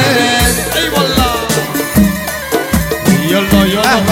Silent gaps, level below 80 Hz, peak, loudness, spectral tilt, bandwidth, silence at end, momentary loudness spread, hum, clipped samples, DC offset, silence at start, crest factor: none; -26 dBFS; 0 dBFS; -12 LUFS; -4 dB/octave; 17 kHz; 0 s; 5 LU; none; under 0.1%; under 0.1%; 0 s; 12 dB